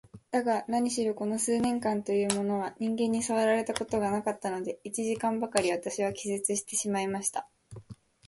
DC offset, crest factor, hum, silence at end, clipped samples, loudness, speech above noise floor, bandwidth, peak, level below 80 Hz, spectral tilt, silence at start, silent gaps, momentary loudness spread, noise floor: under 0.1%; 22 dB; none; 0.35 s; under 0.1%; -30 LUFS; 20 dB; 12 kHz; -8 dBFS; -66 dBFS; -4 dB/octave; 0.15 s; none; 6 LU; -50 dBFS